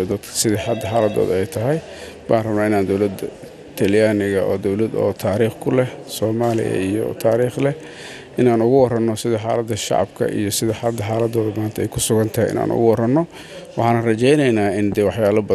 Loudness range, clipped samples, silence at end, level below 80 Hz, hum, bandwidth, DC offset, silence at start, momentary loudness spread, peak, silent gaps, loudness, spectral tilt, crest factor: 2 LU; under 0.1%; 0 s; -50 dBFS; none; 15 kHz; under 0.1%; 0 s; 8 LU; -2 dBFS; none; -19 LUFS; -5.5 dB/octave; 16 dB